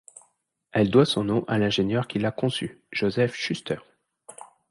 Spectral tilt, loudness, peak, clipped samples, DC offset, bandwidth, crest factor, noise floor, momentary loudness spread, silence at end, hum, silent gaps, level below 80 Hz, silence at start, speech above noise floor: -6 dB/octave; -25 LUFS; -4 dBFS; under 0.1%; under 0.1%; 11.5 kHz; 22 dB; -68 dBFS; 12 LU; 0.25 s; none; none; -58 dBFS; 0.75 s; 44 dB